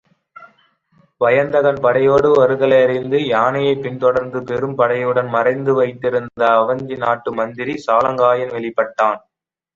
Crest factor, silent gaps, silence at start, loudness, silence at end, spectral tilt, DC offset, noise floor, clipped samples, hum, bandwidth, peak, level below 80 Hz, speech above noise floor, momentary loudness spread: 16 dB; none; 0.4 s; -16 LUFS; 0.55 s; -7 dB/octave; under 0.1%; -57 dBFS; under 0.1%; none; 7.4 kHz; -2 dBFS; -56 dBFS; 41 dB; 8 LU